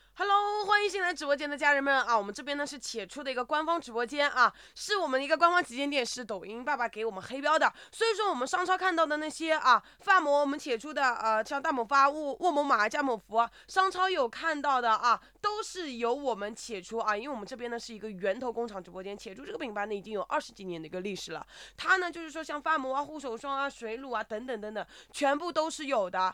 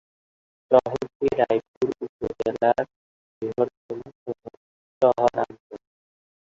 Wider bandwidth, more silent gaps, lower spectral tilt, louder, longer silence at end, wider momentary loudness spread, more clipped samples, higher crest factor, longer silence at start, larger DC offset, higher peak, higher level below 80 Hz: first, 16 kHz vs 7.6 kHz; second, none vs 1.15-1.20 s, 1.68-1.81 s, 2.09-2.19 s, 2.96-3.41 s, 3.77-3.89 s, 4.15-4.26 s, 4.57-5.01 s, 5.60-5.70 s; second, -2.5 dB/octave vs -7 dB/octave; second, -30 LUFS vs -24 LUFS; second, 0 s vs 0.7 s; second, 13 LU vs 16 LU; neither; about the same, 20 dB vs 22 dB; second, 0.15 s vs 0.7 s; neither; second, -10 dBFS vs -2 dBFS; second, -68 dBFS vs -58 dBFS